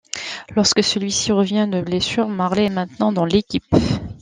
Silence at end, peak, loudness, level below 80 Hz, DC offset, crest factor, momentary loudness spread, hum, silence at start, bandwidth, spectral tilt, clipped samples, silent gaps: 0.05 s; -2 dBFS; -19 LUFS; -44 dBFS; under 0.1%; 18 dB; 5 LU; none; 0.15 s; 9.8 kHz; -4.5 dB/octave; under 0.1%; none